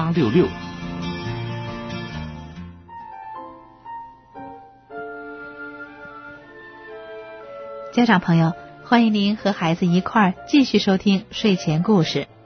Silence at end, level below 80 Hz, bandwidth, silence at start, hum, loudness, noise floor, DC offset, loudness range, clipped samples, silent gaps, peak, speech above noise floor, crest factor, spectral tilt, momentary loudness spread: 0.2 s; -50 dBFS; 6.6 kHz; 0 s; none; -20 LUFS; -42 dBFS; under 0.1%; 18 LU; under 0.1%; none; -4 dBFS; 24 dB; 18 dB; -6.5 dB/octave; 22 LU